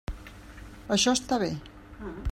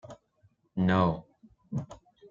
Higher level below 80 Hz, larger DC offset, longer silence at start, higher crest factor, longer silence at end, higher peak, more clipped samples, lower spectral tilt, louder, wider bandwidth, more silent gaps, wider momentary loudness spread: first, -44 dBFS vs -58 dBFS; neither; about the same, 0.1 s vs 0.05 s; about the same, 18 dB vs 20 dB; about the same, 0 s vs 0.05 s; about the same, -12 dBFS vs -12 dBFS; neither; second, -3.5 dB/octave vs -8.5 dB/octave; first, -27 LUFS vs -30 LUFS; first, 16 kHz vs 7.2 kHz; neither; first, 23 LU vs 20 LU